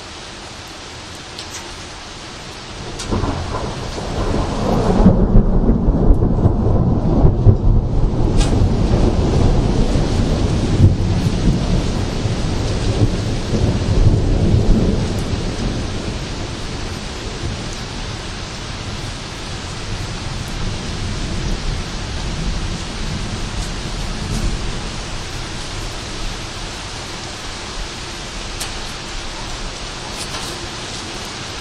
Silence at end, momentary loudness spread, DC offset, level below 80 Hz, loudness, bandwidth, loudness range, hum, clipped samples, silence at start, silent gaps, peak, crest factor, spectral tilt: 0 s; 12 LU; under 0.1%; -22 dBFS; -20 LUFS; 12.5 kHz; 10 LU; none; under 0.1%; 0 s; none; 0 dBFS; 18 dB; -6 dB/octave